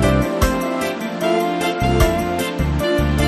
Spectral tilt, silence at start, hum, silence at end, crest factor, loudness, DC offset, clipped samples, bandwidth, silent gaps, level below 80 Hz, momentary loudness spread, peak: -5.5 dB/octave; 0 s; none; 0 s; 16 dB; -19 LUFS; under 0.1%; under 0.1%; 13.5 kHz; none; -26 dBFS; 5 LU; -2 dBFS